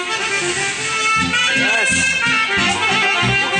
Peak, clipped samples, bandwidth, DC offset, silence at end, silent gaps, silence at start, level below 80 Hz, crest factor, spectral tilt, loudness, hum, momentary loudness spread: -4 dBFS; under 0.1%; 11 kHz; under 0.1%; 0 s; none; 0 s; -46 dBFS; 12 dB; -2 dB/octave; -15 LUFS; none; 5 LU